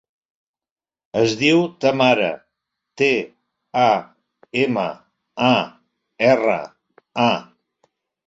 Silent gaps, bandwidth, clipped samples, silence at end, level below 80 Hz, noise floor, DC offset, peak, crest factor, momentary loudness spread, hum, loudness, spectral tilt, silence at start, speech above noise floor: none; 7.8 kHz; under 0.1%; 0.85 s; -64 dBFS; -78 dBFS; under 0.1%; -2 dBFS; 20 dB; 13 LU; none; -19 LUFS; -5 dB/octave; 1.15 s; 61 dB